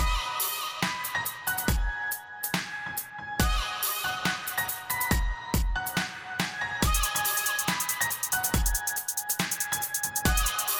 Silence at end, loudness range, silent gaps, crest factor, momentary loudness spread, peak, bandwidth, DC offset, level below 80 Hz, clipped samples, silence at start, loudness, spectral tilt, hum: 0 s; 3 LU; none; 20 dB; 6 LU; -8 dBFS; 19.5 kHz; under 0.1%; -34 dBFS; under 0.1%; 0 s; -28 LUFS; -2 dB/octave; none